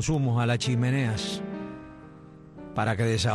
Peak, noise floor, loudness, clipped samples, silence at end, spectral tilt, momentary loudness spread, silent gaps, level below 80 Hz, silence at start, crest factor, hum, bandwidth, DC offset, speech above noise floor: -14 dBFS; -47 dBFS; -27 LUFS; under 0.1%; 0 s; -5.5 dB/octave; 22 LU; none; -50 dBFS; 0 s; 14 dB; none; 12 kHz; under 0.1%; 22 dB